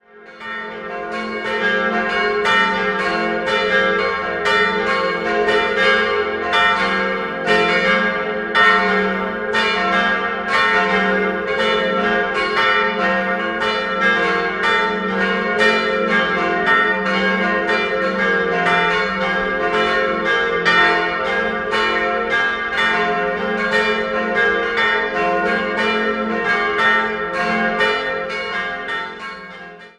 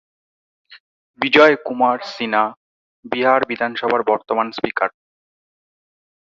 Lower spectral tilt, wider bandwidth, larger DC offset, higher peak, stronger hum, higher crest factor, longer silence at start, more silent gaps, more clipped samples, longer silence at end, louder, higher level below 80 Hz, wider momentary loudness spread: about the same, -4.5 dB/octave vs -5 dB/octave; first, 11.5 kHz vs 7.4 kHz; neither; about the same, 0 dBFS vs 0 dBFS; neither; about the same, 16 dB vs 20 dB; second, 0.15 s vs 0.7 s; second, none vs 0.80-1.14 s, 2.57-3.03 s; neither; second, 0.1 s vs 1.35 s; about the same, -17 LUFS vs -18 LUFS; first, -48 dBFS vs -64 dBFS; second, 7 LU vs 11 LU